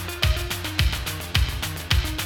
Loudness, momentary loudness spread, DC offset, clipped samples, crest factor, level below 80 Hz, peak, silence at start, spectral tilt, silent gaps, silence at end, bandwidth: -25 LUFS; 3 LU; 0.1%; under 0.1%; 20 dB; -28 dBFS; -4 dBFS; 0 s; -3.5 dB/octave; none; 0 s; 19 kHz